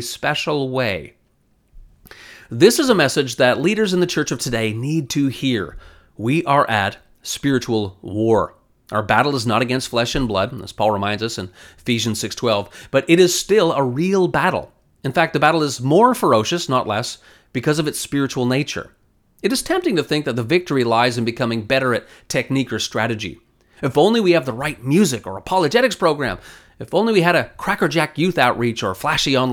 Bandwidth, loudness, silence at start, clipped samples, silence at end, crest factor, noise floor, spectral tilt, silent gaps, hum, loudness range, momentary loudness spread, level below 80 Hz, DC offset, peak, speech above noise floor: 19 kHz; -18 LUFS; 0 s; under 0.1%; 0 s; 18 dB; -61 dBFS; -4.5 dB/octave; none; none; 3 LU; 10 LU; -48 dBFS; under 0.1%; 0 dBFS; 42 dB